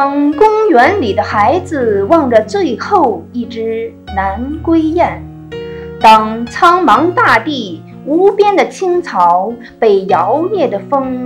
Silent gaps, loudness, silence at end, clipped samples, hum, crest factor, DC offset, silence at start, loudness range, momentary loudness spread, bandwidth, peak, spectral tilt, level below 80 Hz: none; -11 LUFS; 0 s; 1%; none; 12 dB; under 0.1%; 0 s; 4 LU; 13 LU; 15 kHz; 0 dBFS; -6 dB/octave; -40 dBFS